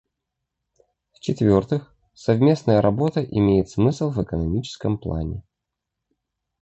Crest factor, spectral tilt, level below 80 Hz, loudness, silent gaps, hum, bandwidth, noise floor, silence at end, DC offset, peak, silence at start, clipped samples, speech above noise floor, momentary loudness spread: 18 dB; -8 dB/octave; -42 dBFS; -22 LUFS; none; none; 8.2 kHz; -83 dBFS; 1.2 s; under 0.1%; -4 dBFS; 1.25 s; under 0.1%; 63 dB; 11 LU